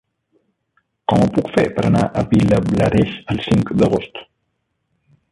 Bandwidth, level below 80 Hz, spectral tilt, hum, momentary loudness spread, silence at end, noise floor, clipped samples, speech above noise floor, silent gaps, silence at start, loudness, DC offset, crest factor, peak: 11.5 kHz; -38 dBFS; -7.5 dB/octave; none; 8 LU; 1.1 s; -71 dBFS; under 0.1%; 55 dB; none; 1.1 s; -17 LUFS; under 0.1%; 16 dB; -2 dBFS